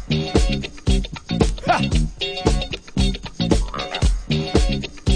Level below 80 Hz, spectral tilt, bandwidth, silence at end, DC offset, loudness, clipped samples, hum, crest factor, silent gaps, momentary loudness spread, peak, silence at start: -24 dBFS; -5.5 dB/octave; 10 kHz; 0 s; under 0.1%; -22 LUFS; under 0.1%; none; 18 dB; none; 6 LU; -2 dBFS; 0 s